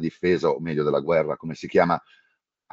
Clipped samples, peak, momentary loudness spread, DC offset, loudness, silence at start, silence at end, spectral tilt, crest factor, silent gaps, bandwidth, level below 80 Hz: under 0.1%; -4 dBFS; 7 LU; under 0.1%; -23 LUFS; 0 s; 0.75 s; -7.5 dB/octave; 20 dB; none; 7.6 kHz; -58 dBFS